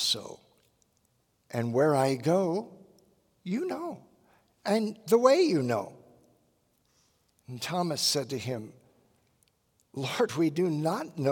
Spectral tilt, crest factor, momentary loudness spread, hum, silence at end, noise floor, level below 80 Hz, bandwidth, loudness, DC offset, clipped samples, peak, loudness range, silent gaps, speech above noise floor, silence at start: -5 dB/octave; 22 dB; 20 LU; none; 0 s; -72 dBFS; -78 dBFS; 18 kHz; -28 LUFS; under 0.1%; under 0.1%; -8 dBFS; 5 LU; none; 44 dB; 0 s